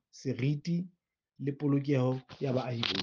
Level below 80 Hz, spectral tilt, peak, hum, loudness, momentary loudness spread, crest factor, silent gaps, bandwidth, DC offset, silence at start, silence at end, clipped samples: -70 dBFS; -7 dB/octave; -10 dBFS; none; -33 LUFS; 9 LU; 24 dB; none; 7.2 kHz; under 0.1%; 0.15 s; 0 s; under 0.1%